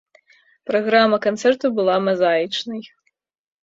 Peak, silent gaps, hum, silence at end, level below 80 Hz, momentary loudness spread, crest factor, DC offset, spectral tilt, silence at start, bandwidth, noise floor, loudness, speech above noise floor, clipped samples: -2 dBFS; none; none; 0.75 s; -66 dBFS; 13 LU; 18 dB; under 0.1%; -5 dB/octave; 0.65 s; 7.8 kHz; -70 dBFS; -18 LUFS; 51 dB; under 0.1%